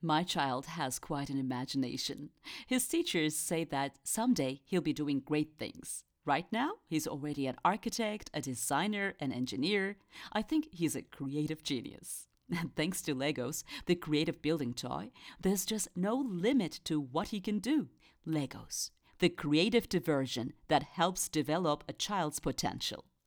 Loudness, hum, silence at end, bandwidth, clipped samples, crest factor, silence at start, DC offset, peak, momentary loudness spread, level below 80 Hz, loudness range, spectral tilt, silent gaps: -35 LUFS; none; 0.25 s; over 20 kHz; under 0.1%; 20 dB; 0 s; under 0.1%; -14 dBFS; 8 LU; -62 dBFS; 3 LU; -4 dB/octave; none